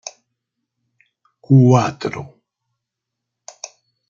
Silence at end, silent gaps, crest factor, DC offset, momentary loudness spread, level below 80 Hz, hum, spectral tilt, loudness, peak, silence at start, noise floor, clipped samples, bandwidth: 1.85 s; none; 18 dB; under 0.1%; 24 LU; -62 dBFS; none; -7.5 dB/octave; -15 LUFS; -2 dBFS; 1.5 s; -81 dBFS; under 0.1%; 7.4 kHz